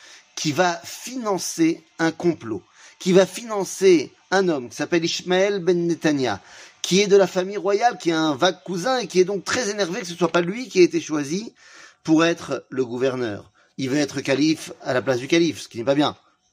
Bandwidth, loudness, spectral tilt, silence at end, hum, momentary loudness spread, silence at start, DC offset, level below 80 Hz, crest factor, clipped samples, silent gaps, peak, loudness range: 15.5 kHz; -22 LUFS; -4.5 dB/octave; 0.4 s; none; 11 LU; 0.1 s; under 0.1%; -68 dBFS; 20 dB; under 0.1%; none; -2 dBFS; 3 LU